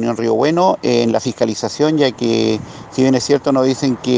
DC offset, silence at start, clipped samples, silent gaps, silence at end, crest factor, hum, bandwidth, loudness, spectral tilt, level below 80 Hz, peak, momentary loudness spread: under 0.1%; 0 s; under 0.1%; none; 0 s; 14 dB; none; 9.8 kHz; -16 LUFS; -5.5 dB/octave; -54 dBFS; 0 dBFS; 5 LU